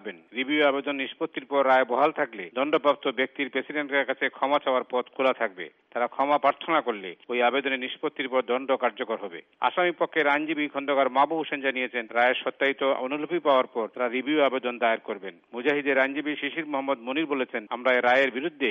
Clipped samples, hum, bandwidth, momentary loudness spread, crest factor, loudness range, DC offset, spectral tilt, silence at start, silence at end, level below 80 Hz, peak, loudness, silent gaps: under 0.1%; none; 6.8 kHz; 8 LU; 18 dB; 2 LU; under 0.1%; -1 dB/octave; 0.05 s; 0 s; -80 dBFS; -8 dBFS; -26 LUFS; none